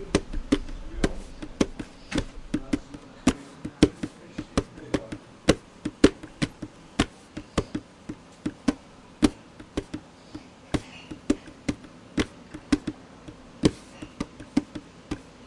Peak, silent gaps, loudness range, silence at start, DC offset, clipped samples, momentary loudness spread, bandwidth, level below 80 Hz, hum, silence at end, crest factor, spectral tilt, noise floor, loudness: -2 dBFS; none; 5 LU; 0 s; under 0.1%; under 0.1%; 18 LU; 11.5 kHz; -42 dBFS; none; 0 s; 28 dB; -5.5 dB/octave; -47 dBFS; -29 LUFS